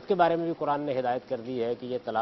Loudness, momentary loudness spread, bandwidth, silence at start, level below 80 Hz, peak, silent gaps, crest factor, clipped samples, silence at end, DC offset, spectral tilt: -29 LUFS; 8 LU; 6 kHz; 0 s; -68 dBFS; -8 dBFS; none; 20 dB; under 0.1%; 0 s; under 0.1%; -8 dB/octave